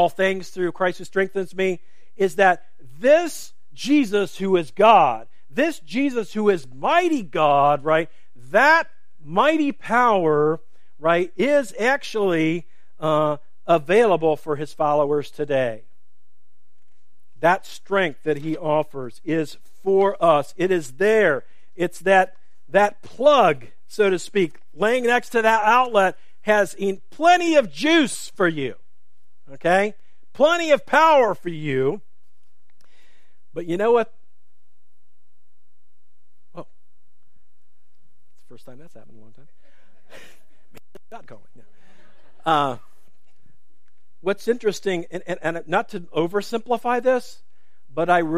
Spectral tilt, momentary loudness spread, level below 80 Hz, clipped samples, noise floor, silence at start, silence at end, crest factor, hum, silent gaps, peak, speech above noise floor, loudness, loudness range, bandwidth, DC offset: -5 dB/octave; 11 LU; -68 dBFS; under 0.1%; -76 dBFS; 0 s; 0 s; 20 dB; none; none; -2 dBFS; 56 dB; -20 LUFS; 9 LU; 15.5 kHz; 2%